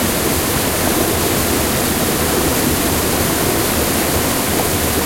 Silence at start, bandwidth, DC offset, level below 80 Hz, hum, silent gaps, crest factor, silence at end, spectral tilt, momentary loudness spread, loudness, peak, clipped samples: 0 s; 16.5 kHz; under 0.1%; -32 dBFS; none; none; 14 dB; 0 s; -3.5 dB/octave; 1 LU; -15 LUFS; -2 dBFS; under 0.1%